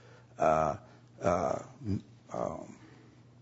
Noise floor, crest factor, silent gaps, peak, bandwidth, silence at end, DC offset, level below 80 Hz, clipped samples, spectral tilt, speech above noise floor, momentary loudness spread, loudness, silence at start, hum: -56 dBFS; 20 dB; none; -14 dBFS; 8 kHz; 0.45 s; under 0.1%; -60 dBFS; under 0.1%; -7 dB/octave; 25 dB; 16 LU; -33 LUFS; 0.05 s; none